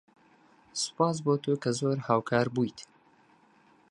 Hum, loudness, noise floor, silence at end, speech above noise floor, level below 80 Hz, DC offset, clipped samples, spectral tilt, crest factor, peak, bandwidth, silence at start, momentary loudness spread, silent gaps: none; -29 LUFS; -62 dBFS; 1.05 s; 34 dB; -72 dBFS; under 0.1%; under 0.1%; -5 dB/octave; 20 dB; -10 dBFS; 11.5 kHz; 0.75 s; 7 LU; none